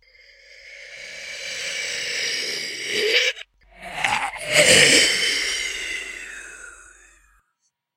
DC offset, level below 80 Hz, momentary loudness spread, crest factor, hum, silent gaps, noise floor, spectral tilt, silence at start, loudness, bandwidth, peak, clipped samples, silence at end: under 0.1%; -56 dBFS; 23 LU; 24 dB; none; none; -73 dBFS; -0.5 dB/octave; 0.5 s; -19 LUFS; 16 kHz; 0 dBFS; under 0.1%; 1.15 s